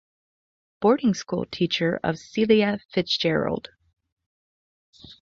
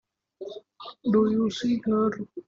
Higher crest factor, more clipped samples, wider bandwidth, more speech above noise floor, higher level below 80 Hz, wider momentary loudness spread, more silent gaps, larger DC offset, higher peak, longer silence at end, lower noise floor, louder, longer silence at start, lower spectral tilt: about the same, 18 dB vs 16 dB; neither; about the same, 7.6 kHz vs 7.6 kHz; first, over 67 dB vs 20 dB; first, -58 dBFS vs -64 dBFS; second, 8 LU vs 19 LU; first, 4.12-4.17 s, 4.26-4.93 s vs none; neither; first, -6 dBFS vs -12 dBFS; first, 0.2 s vs 0.05 s; first, under -90 dBFS vs -45 dBFS; about the same, -24 LUFS vs -25 LUFS; first, 0.8 s vs 0.4 s; about the same, -5.5 dB/octave vs -6.5 dB/octave